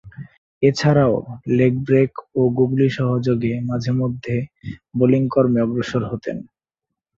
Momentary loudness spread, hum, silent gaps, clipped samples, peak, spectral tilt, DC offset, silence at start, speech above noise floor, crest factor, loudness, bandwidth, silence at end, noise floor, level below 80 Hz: 12 LU; none; 0.38-0.61 s; under 0.1%; -2 dBFS; -8 dB/octave; under 0.1%; 0.05 s; 65 dB; 16 dB; -19 LUFS; 7.6 kHz; 0.75 s; -83 dBFS; -52 dBFS